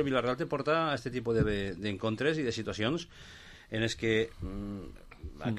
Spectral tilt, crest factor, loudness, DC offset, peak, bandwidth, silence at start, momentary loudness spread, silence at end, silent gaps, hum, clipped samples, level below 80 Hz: -5.5 dB/octave; 16 dB; -32 LUFS; under 0.1%; -16 dBFS; 12.5 kHz; 0 s; 19 LU; 0 s; none; none; under 0.1%; -50 dBFS